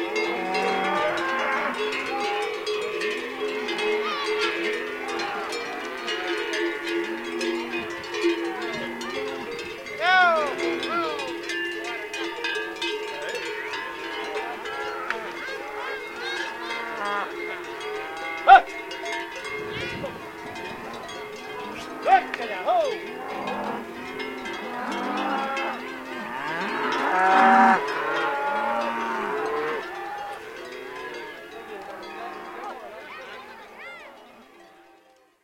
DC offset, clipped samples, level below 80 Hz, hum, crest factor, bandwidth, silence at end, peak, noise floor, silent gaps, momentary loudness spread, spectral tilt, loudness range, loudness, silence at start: under 0.1%; under 0.1%; -64 dBFS; none; 26 dB; 16.5 kHz; 0.75 s; -2 dBFS; -58 dBFS; none; 15 LU; -3 dB/octave; 11 LU; -26 LUFS; 0 s